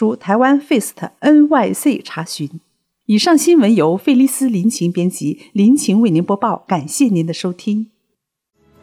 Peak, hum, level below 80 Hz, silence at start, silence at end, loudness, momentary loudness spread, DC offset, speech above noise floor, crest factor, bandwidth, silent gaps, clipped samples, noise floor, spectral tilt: -2 dBFS; none; -70 dBFS; 0 s; 1 s; -15 LUFS; 12 LU; under 0.1%; 59 dB; 12 dB; 16 kHz; none; under 0.1%; -73 dBFS; -5.5 dB/octave